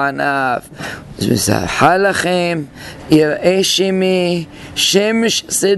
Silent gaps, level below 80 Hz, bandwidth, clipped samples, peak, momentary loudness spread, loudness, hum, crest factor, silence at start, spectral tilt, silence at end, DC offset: none; -44 dBFS; 12.5 kHz; under 0.1%; 0 dBFS; 12 LU; -14 LUFS; none; 14 dB; 0 s; -3.5 dB/octave; 0 s; under 0.1%